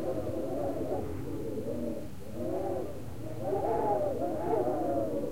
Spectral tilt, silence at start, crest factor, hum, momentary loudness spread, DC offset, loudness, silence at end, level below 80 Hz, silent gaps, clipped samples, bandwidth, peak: -8 dB/octave; 0 s; 16 dB; none; 9 LU; 1%; -34 LUFS; 0 s; -54 dBFS; none; under 0.1%; 16.5 kHz; -18 dBFS